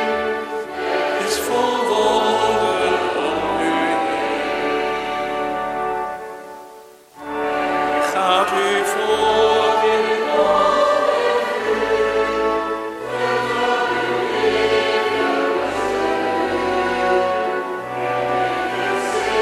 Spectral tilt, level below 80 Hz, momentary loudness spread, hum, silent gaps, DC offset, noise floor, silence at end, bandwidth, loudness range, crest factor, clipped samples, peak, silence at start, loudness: -3.5 dB/octave; -50 dBFS; 8 LU; none; none; under 0.1%; -42 dBFS; 0 s; 15.5 kHz; 5 LU; 18 dB; under 0.1%; -2 dBFS; 0 s; -19 LUFS